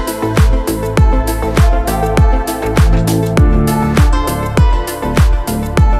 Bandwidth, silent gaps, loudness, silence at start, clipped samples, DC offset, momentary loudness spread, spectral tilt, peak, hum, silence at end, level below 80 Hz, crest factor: 15.5 kHz; none; -13 LUFS; 0 s; under 0.1%; under 0.1%; 4 LU; -6.5 dB/octave; 0 dBFS; none; 0 s; -14 dBFS; 10 dB